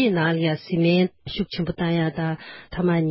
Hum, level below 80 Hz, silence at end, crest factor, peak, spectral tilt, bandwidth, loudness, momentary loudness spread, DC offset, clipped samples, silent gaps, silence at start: none; -50 dBFS; 0 s; 14 dB; -8 dBFS; -11.5 dB/octave; 5.8 kHz; -23 LUFS; 9 LU; under 0.1%; under 0.1%; none; 0 s